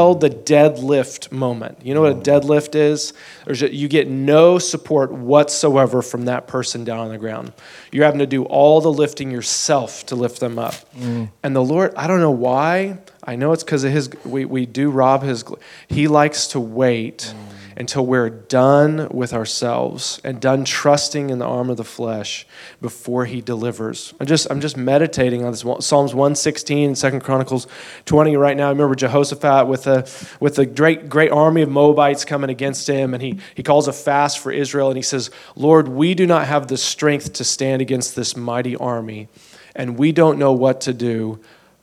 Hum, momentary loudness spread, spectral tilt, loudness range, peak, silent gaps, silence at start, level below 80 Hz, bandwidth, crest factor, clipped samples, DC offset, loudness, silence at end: none; 13 LU; -5 dB/octave; 4 LU; 0 dBFS; none; 0 s; -56 dBFS; 15 kHz; 18 dB; under 0.1%; under 0.1%; -17 LUFS; 0.45 s